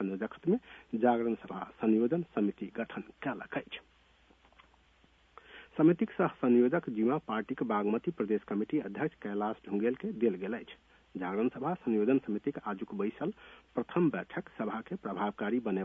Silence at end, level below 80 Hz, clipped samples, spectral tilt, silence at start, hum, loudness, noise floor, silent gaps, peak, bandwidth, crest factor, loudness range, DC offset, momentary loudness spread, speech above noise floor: 0 s; -70 dBFS; under 0.1%; -9.5 dB/octave; 0 s; none; -33 LUFS; -66 dBFS; none; -14 dBFS; 3.8 kHz; 20 dB; 5 LU; under 0.1%; 12 LU; 34 dB